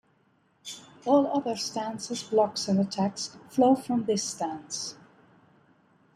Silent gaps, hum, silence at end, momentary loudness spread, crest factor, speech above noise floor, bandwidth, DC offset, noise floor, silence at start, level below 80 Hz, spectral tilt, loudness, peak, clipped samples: none; none; 1.2 s; 14 LU; 20 dB; 40 dB; 13.5 kHz; under 0.1%; -67 dBFS; 0.65 s; -72 dBFS; -5 dB/octave; -28 LUFS; -10 dBFS; under 0.1%